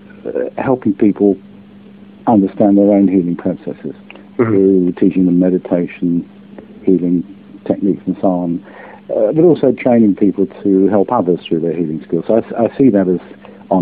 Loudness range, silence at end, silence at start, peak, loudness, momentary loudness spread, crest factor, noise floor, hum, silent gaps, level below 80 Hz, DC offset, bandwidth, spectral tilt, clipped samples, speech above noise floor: 3 LU; 0 s; 0.15 s; 0 dBFS; -14 LUFS; 12 LU; 14 dB; -38 dBFS; none; none; -52 dBFS; under 0.1%; 4 kHz; -12.5 dB/octave; under 0.1%; 25 dB